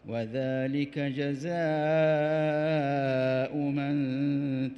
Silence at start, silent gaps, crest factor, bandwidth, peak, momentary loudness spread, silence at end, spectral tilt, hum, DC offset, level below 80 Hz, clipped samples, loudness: 0.05 s; none; 12 dB; 7.6 kHz; -16 dBFS; 6 LU; 0 s; -8 dB/octave; none; under 0.1%; -68 dBFS; under 0.1%; -29 LUFS